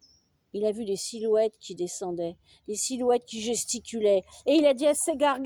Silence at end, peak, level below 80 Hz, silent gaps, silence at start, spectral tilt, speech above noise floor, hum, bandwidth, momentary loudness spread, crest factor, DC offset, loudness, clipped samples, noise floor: 0 s; -10 dBFS; -66 dBFS; none; 0.55 s; -3 dB/octave; 37 dB; none; 19.5 kHz; 12 LU; 16 dB; under 0.1%; -27 LUFS; under 0.1%; -64 dBFS